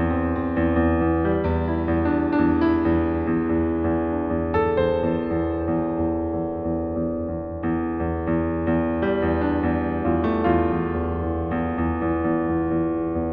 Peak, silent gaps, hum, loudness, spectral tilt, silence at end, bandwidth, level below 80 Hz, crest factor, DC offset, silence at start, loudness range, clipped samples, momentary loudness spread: -8 dBFS; none; none; -23 LUFS; -8 dB/octave; 0 s; 4.9 kHz; -36 dBFS; 14 dB; under 0.1%; 0 s; 3 LU; under 0.1%; 5 LU